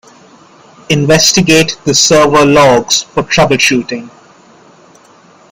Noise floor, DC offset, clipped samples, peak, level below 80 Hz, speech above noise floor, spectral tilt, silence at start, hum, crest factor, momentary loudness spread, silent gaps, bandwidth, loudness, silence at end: -42 dBFS; under 0.1%; 0.1%; 0 dBFS; -40 dBFS; 33 dB; -3.5 dB/octave; 0.9 s; none; 10 dB; 8 LU; none; 20 kHz; -8 LUFS; 1.45 s